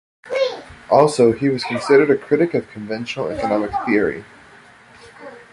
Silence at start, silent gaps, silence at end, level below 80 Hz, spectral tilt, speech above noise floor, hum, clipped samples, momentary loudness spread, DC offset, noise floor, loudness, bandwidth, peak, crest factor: 0.25 s; none; 0.1 s; -52 dBFS; -6 dB/octave; 29 dB; none; under 0.1%; 17 LU; under 0.1%; -46 dBFS; -18 LUFS; 11.5 kHz; -2 dBFS; 18 dB